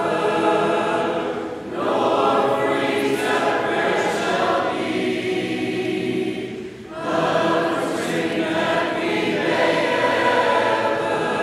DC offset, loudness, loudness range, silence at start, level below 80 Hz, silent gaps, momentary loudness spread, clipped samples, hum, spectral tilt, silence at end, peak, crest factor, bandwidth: under 0.1%; -21 LUFS; 3 LU; 0 s; -58 dBFS; none; 7 LU; under 0.1%; none; -4.5 dB/octave; 0 s; -6 dBFS; 14 dB; 15 kHz